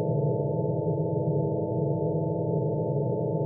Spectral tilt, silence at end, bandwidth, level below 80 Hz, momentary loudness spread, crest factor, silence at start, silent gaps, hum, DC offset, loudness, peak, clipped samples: -6.5 dB/octave; 0 s; 1 kHz; -58 dBFS; 1 LU; 12 dB; 0 s; none; none; under 0.1%; -28 LUFS; -16 dBFS; under 0.1%